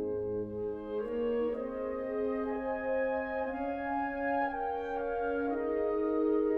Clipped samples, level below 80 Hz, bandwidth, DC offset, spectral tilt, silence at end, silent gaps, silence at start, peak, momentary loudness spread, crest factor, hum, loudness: under 0.1%; -56 dBFS; 5.2 kHz; under 0.1%; -8.5 dB/octave; 0 s; none; 0 s; -20 dBFS; 5 LU; 14 dB; none; -34 LUFS